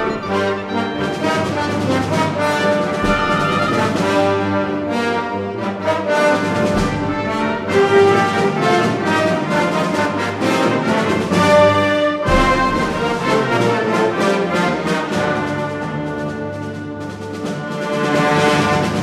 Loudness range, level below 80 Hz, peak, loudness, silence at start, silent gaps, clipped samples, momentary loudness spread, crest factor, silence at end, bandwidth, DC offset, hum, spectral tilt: 5 LU; -36 dBFS; -2 dBFS; -17 LUFS; 0 s; none; under 0.1%; 9 LU; 14 dB; 0 s; 15 kHz; under 0.1%; none; -5.5 dB/octave